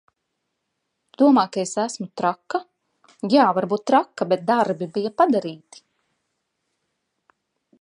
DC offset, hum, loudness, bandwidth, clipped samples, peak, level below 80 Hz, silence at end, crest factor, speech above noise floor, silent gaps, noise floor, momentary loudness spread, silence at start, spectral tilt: under 0.1%; none; -21 LUFS; 11 kHz; under 0.1%; -4 dBFS; -78 dBFS; 2.25 s; 20 dB; 57 dB; none; -77 dBFS; 12 LU; 1.2 s; -5.5 dB/octave